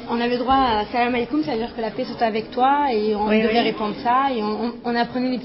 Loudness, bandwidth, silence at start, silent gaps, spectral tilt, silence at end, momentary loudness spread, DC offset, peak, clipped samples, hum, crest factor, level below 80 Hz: -21 LUFS; 5.8 kHz; 0 s; none; -9.5 dB/octave; 0 s; 7 LU; under 0.1%; -6 dBFS; under 0.1%; none; 14 dB; -48 dBFS